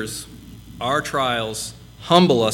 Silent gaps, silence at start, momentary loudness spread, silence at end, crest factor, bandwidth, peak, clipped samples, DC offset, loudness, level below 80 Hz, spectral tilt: none; 0 s; 23 LU; 0 s; 20 dB; 17 kHz; 0 dBFS; under 0.1%; under 0.1%; -20 LUFS; -48 dBFS; -4.5 dB/octave